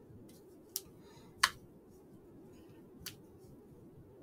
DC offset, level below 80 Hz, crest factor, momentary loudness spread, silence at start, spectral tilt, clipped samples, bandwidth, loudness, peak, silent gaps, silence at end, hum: under 0.1%; -72 dBFS; 40 dB; 25 LU; 0 s; -1 dB/octave; under 0.1%; 16 kHz; -38 LUFS; -4 dBFS; none; 0 s; none